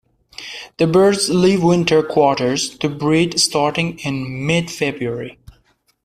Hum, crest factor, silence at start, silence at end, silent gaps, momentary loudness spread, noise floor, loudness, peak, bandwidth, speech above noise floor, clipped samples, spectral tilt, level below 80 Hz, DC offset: none; 16 dB; 0.4 s; 0.75 s; none; 15 LU; -59 dBFS; -17 LUFS; -2 dBFS; 15 kHz; 43 dB; under 0.1%; -4.5 dB/octave; -50 dBFS; under 0.1%